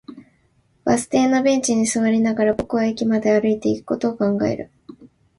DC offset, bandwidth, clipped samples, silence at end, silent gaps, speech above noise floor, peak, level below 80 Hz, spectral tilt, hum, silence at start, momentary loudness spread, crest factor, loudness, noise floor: under 0.1%; 11.5 kHz; under 0.1%; 0.35 s; none; 42 dB; -4 dBFS; -54 dBFS; -5 dB/octave; none; 0.1 s; 6 LU; 16 dB; -19 LUFS; -61 dBFS